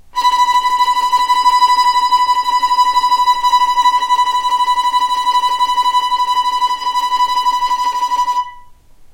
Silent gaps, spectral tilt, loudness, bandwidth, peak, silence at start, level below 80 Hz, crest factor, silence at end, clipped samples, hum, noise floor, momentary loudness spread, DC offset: none; 1 dB/octave; -13 LUFS; 16 kHz; -2 dBFS; 0.15 s; -46 dBFS; 12 dB; 0 s; under 0.1%; none; -40 dBFS; 4 LU; under 0.1%